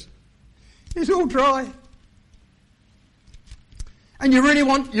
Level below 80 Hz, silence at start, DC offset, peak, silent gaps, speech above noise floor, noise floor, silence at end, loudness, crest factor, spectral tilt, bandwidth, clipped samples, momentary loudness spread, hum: -44 dBFS; 0 s; under 0.1%; -6 dBFS; none; 39 dB; -57 dBFS; 0 s; -19 LUFS; 16 dB; -4 dB/octave; 11.5 kHz; under 0.1%; 20 LU; none